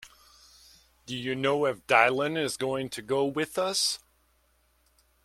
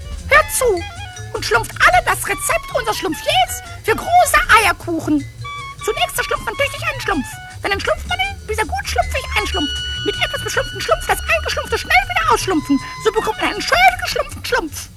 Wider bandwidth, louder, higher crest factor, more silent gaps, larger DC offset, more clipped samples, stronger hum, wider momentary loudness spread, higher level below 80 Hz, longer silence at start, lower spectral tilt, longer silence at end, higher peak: about the same, 16 kHz vs 15.5 kHz; second, -27 LUFS vs -17 LUFS; first, 24 dB vs 18 dB; neither; neither; neither; neither; about the same, 11 LU vs 10 LU; second, -66 dBFS vs -32 dBFS; about the same, 0 s vs 0 s; about the same, -3 dB/octave vs -3 dB/octave; first, 1.25 s vs 0 s; second, -6 dBFS vs 0 dBFS